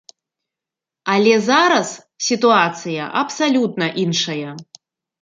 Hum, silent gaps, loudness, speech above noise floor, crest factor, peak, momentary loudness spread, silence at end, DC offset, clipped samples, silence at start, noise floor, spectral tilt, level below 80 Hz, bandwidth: none; none; -17 LUFS; 70 dB; 18 dB; -2 dBFS; 14 LU; 0.6 s; under 0.1%; under 0.1%; 1.05 s; -87 dBFS; -4 dB/octave; -68 dBFS; 9.4 kHz